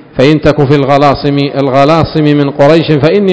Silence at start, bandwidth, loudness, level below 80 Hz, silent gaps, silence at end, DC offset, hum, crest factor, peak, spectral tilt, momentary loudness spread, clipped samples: 0.15 s; 8 kHz; -8 LUFS; -32 dBFS; none; 0 s; 1%; none; 8 dB; 0 dBFS; -7.5 dB/octave; 3 LU; 5%